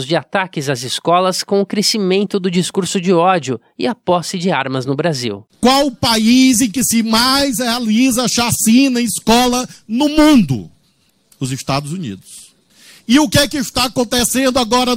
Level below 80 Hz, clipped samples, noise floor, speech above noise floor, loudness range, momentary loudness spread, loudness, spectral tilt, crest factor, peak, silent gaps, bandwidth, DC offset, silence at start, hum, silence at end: -42 dBFS; under 0.1%; -58 dBFS; 44 dB; 5 LU; 10 LU; -14 LUFS; -4 dB/octave; 14 dB; 0 dBFS; none; 16.5 kHz; under 0.1%; 0 s; none; 0 s